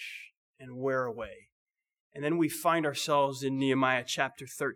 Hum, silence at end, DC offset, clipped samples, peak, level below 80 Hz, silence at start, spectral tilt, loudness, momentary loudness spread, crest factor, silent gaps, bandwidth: none; 0 s; under 0.1%; under 0.1%; -12 dBFS; -70 dBFS; 0 s; -4.5 dB/octave; -30 LUFS; 15 LU; 20 dB; 0.37-0.54 s, 1.52-1.66 s, 2.00-2.10 s; 19.5 kHz